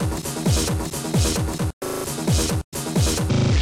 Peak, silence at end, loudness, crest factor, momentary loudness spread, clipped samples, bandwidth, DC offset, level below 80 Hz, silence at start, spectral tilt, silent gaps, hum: -10 dBFS; 0 s; -23 LUFS; 12 dB; 6 LU; under 0.1%; 16.5 kHz; under 0.1%; -30 dBFS; 0 s; -5 dB/octave; 1.73-1.81 s, 2.64-2.72 s; none